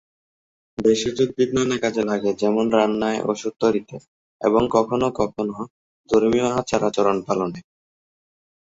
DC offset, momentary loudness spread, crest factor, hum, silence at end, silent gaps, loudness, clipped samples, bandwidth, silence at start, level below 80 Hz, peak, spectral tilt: under 0.1%; 10 LU; 18 dB; none; 1 s; 4.08-4.39 s, 5.70-6.04 s; -21 LUFS; under 0.1%; 8 kHz; 0.8 s; -54 dBFS; -2 dBFS; -5.5 dB/octave